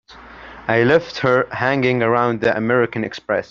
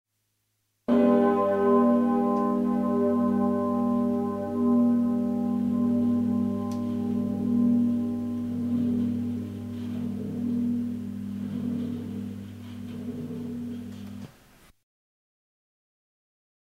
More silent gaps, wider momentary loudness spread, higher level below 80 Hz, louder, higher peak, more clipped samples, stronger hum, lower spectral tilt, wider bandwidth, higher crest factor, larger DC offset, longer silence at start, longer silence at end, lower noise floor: neither; second, 10 LU vs 14 LU; first, -52 dBFS vs -64 dBFS; first, -18 LUFS vs -26 LUFS; first, -2 dBFS vs -10 dBFS; neither; neither; second, -7 dB/octave vs -9 dB/octave; first, 7.2 kHz vs 6.2 kHz; about the same, 16 dB vs 18 dB; neither; second, 0.1 s vs 0.9 s; second, 0.05 s vs 2.45 s; second, -39 dBFS vs -76 dBFS